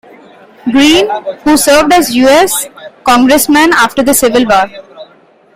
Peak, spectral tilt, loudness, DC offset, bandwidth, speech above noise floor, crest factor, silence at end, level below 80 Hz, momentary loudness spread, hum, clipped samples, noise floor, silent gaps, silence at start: 0 dBFS; -2.5 dB/octave; -8 LUFS; under 0.1%; 16.5 kHz; 36 dB; 10 dB; 0.5 s; -38 dBFS; 9 LU; none; 0.1%; -43 dBFS; none; 0.65 s